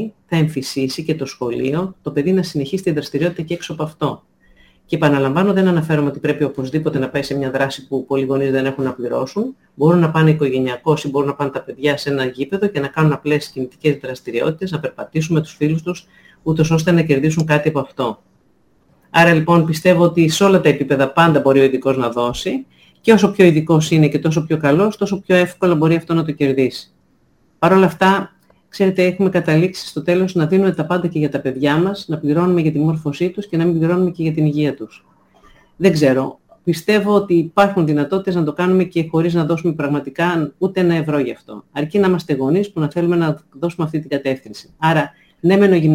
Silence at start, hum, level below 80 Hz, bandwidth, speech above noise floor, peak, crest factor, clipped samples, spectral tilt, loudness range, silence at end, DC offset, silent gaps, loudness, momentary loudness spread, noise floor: 0 s; none; -52 dBFS; 16 kHz; 42 dB; 0 dBFS; 16 dB; under 0.1%; -7 dB/octave; 5 LU; 0 s; under 0.1%; none; -17 LUFS; 10 LU; -58 dBFS